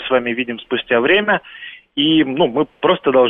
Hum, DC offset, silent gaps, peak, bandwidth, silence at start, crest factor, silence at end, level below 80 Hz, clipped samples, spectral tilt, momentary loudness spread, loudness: none; under 0.1%; none; -2 dBFS; 3.9 kHz; 0 s; 14 dB; 0 s; -56 dBFS; under 0.1%; -8.5 dB/octave; 10 LU; -16 LUFS